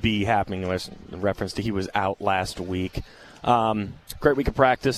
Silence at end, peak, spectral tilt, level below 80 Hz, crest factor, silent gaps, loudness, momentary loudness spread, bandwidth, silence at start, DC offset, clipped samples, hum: 0 s; -4 dBFS; -5.5 dB/octave; -42 dBFS; 20 dB; none; -25 LUFS; 11 LU; 14.5 kHz; 0 s; under 0.1%; under 0.1%; none